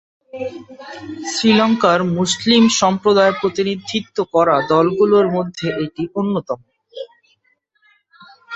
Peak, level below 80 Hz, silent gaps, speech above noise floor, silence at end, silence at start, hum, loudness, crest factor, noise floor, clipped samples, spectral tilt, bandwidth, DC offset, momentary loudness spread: 0 dBFS; -56 dBFS; none; 47 dB; 0 s; 0.35 s; none; -16 LUFS; 16 dB; -63 dBFS; under 0.1%; -4.5 dB/octave; 8.2 kHz; under 0.1%; 20 LU